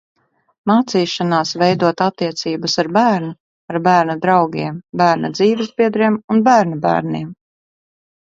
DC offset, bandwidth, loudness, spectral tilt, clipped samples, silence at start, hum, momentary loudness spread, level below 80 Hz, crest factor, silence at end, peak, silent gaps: under 0.1%; 7.8 kHz; -16 LUFS; -5.5 dB/octave; under 0.1%; 0.65 s; none; 10 LU; -60 dBFS; 16 dB; 0.95 s; 0 dBFS; 3.40-3.68 s, 6.24-6.28 s